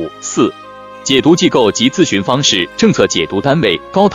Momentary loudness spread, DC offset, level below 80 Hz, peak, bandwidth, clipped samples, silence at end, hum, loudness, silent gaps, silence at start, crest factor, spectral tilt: 7 LU; under 0.1%; -46 dBFS; 0 dBFS; 11.5 kHz; 0.3%; 0 s; none; -12 LUFS; none; 0 s; 12 dB; -4 dB/octave